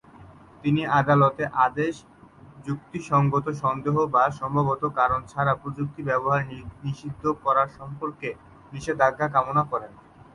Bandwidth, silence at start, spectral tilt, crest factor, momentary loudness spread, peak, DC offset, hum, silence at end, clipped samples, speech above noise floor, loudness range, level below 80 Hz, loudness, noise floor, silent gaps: 11 kHz; 0.15 s; -7.5 dB/octave; 18 dB; 14 LU; -6 dBFS; under 0.1%; none; 0.4 s; under 0.1%; 24 dB; 3 LU; -54 dBFS; -24 LUFS; -48 dBFS; none